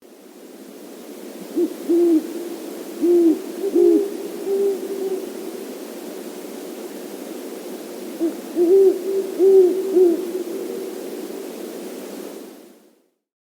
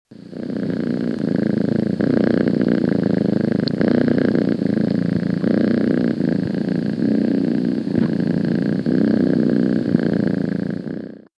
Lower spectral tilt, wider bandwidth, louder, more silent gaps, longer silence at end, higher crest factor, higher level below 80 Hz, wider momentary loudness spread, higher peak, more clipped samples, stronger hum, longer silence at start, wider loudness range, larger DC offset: second, -5 dB/octave vs -9 dB/octave; first, over 20 kHz vs 7.4 kHz; about the same, -20 LUFS vs -19 LUFS; neither; first, 0.75 s vs 0.25 s; about the same, 16 dB vs 18 dB; second, -78 dBFS vs -54 dBFS; first, 20 LU vs 6 LU; second, -4 dBFS vs 0 dBFS; neither; neither; about the same, 0.1 s vs 0.1 s; first, 12 LU vs 1 LU; neither